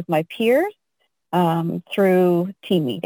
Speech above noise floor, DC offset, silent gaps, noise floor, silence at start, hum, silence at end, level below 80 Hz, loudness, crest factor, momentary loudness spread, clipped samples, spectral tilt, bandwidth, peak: 53 dB; under 0.1%; none; -72 dBFS; 0 s; none; 0.05 s; -70 dBFS; -20 LUFS; 14 dB; 8 LU; under 0.1%; -7.5 dB/octave; 19 kHz; -6 dBFS